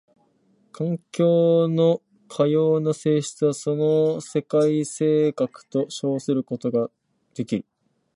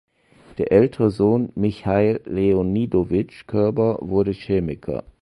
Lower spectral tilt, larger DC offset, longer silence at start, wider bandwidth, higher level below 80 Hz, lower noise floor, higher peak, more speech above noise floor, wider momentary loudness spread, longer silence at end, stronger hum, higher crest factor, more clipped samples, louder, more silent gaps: second, -7 dB/octave vs -9.5 dB/octave; neither; first, 0.8 s vs 0.55 s; about the same, 11.5 kHz vs 11 kHz; second, -70 dBFS vs -44 dBFS; first, -63 dBFS vs -51 dBFS; second, -8 dBFS vs -2 dBFS; first, 41 dB vs 31 dB; about the same, 10 LU vs 9 LU; first, 0.55 s vs 0.2 s; neither; about the same, 16 dB vs 18 dB; neither; about the same, -22 LUFS vs -21 LUFS; neither